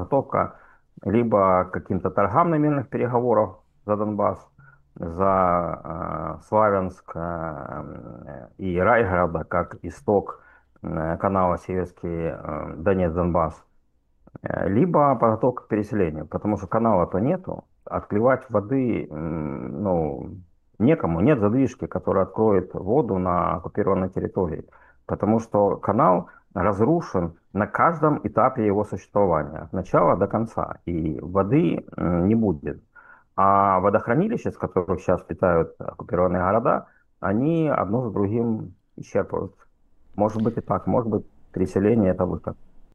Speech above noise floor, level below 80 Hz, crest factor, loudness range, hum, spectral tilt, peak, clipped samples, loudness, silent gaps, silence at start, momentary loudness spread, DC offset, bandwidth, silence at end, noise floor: 40 dB; -48 dBFS; 20 dB; 4 LU; none; -9.5 dB/octave; -2 dBFS; under 0.1%; -23 LUFS; none; 0 s; 12 LU; under 0.1%; 9 kHz; 0.15 s; -62 dBFS